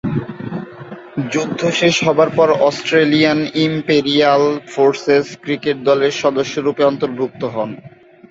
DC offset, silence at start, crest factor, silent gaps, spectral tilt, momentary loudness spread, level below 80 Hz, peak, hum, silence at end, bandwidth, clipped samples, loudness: under 0.1%; 0.05 s; 14 dB; none; -5 dB/octave; 14 LU; -56 dBFS; -2 dBFS; none; 0.45 s; 7.8 kHz; under 0.1%; -15 LUFS